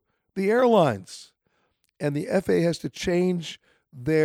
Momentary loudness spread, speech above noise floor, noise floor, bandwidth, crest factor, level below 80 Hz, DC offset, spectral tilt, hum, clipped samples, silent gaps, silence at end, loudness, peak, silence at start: 18 LU; 48 dB; -71 dBFS; 16 kHz; 18 dB; -56 dBFS; under 0.1%; -6.5 dB/octave; none; under 0.1%; none; 0 s; -24 LUFS; -8 dBFS; 0.35 s